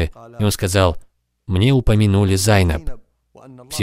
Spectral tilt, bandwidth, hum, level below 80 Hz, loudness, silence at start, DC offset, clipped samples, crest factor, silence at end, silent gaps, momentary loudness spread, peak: -5.5 dB/octave; 16 kHz; none; -30 dBFS; -17 LUFS; 0 s; under 0.1%; under 0.1%; 16 dB; 0 s; none; 13 LU; 0 dBFS